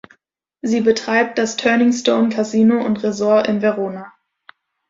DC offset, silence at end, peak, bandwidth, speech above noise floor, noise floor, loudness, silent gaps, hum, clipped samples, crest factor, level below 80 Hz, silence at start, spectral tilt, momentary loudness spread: under 0.1%; 0.8 s; -2 dBFS; 7.8 kHz; 49 dB; -65 dBFS; -17 LUFS; none; none; under 0.1%; 16 dB; -60 dBFS; 0.65 s; -5 dB/octave; 8 LU